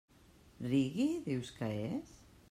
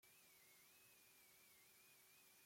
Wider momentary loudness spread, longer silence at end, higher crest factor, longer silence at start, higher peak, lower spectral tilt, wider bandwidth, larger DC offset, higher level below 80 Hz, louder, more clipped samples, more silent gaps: first, 11 LU vs 0 LU; first, 0.35 s vs 0 s; about the same, 16 dB vs 14 dB; first, 0.6 s vs 0 s; first, -22 dBFS vs -58 dBFS; first, -7 dB/octave vs -0.5 dB/octave; second, 14 kHz vs 16.5 kHz; neither; first, -66 dBFS vs under -90 dBFS; first, -37 LUFS vs -68 LUFS; neither; neither